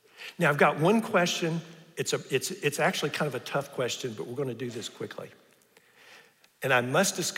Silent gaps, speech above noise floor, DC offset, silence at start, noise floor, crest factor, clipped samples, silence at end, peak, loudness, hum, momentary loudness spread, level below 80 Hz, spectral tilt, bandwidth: none; 33 dB; under 0.1%; 0.2 s; -61 dBFS; 22 dB; under 0.1%; 0 s; -8 dBFS; -28 LUFS; none; 15 LU; -76 dBFS; -4 dB/octave; 16 kHz